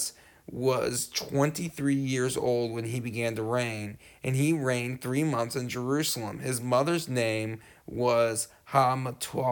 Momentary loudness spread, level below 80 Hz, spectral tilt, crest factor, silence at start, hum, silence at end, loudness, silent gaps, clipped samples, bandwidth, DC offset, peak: 7 LU; -62 dBFS; -5 dB/octave; 20 dB; 0 s; none; 0 s; -29 LUFS; none; under 0.1%; 19.5 kHz; under 0.1%; -10 dBFS